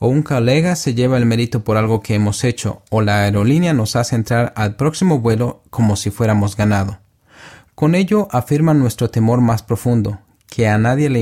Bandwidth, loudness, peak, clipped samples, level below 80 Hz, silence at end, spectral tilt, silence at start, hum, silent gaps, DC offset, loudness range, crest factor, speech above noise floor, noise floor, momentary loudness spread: 15.5 kHz; -16 LUFS; -2 dBFS; under 0.1%; -44 dBFS; 0 s; -6.5 dB/octave; 0 s; none; none; under 0.1%; 2 LU; 14 dB; 28 dB; -43 dBFS; 5 LU